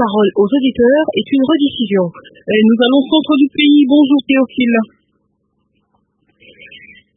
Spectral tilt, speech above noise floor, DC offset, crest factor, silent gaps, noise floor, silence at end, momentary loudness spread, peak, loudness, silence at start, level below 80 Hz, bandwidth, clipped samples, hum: -11 dB/octave; 52 dB; under 0.1%; 14 dB; none; -64 dBFS; 2.3 s; 7 LU; 0 dBFS; -12 LUFS; 0 s; -54 dBFS; 3.9 kHz; under 0.1%; none